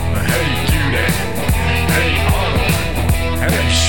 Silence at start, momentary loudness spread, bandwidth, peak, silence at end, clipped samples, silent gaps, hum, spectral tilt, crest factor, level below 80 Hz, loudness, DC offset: 0 s; 3 LU; 19 kHz; -2 dBFS; 0 s; under 0.1%; none; none; -4.5 dB/octave; 14 dB; -22 dBFS; -16 LUFS; 5%